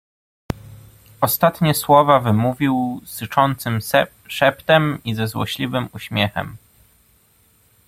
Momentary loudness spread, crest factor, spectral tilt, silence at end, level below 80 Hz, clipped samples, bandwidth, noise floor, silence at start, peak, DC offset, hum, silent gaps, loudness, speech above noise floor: 15 LU; 20 dB; -5 dB/octave; 1.3 s; -50 dBFS; under 0.1%; 16.5 kHz; -57 dBFS; 0.5 s; 0 dBFS; under 0.1%; none; none; -19 LUFS; 39 dB